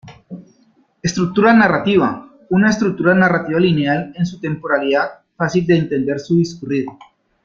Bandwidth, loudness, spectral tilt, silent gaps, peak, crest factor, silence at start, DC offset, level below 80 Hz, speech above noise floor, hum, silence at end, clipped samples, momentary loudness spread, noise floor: 7.4 kHz; -16 LUFS; -6.5 dB/octave; none; -2 dBFS; 16 dB; 0.05 s; under 0.1%; -52 dBFS; 41 dB; none; 0.5 s; under 0.1%; 12 LU; -56 dBFS